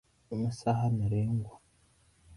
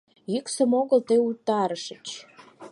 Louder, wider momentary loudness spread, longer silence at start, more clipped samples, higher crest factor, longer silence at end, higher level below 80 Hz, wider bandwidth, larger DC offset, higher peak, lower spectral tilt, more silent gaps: second, -32 LUFS vs -24 LUFS; second, 9 LU vs 16 LU; about the same, 0.3 s vs 0.3 s; neither; about the same, 18 dB vs 16 dB; about the same, 0 s vs 0 s; first, -56 dBFS vs -78 dBFS; about the same, 11.5 kHz vs 11.5 kHz; neither; second, -16 dBFS vs -8 dBFS; first, -8.5 dB/octave vs -4.5 dB/octave; neither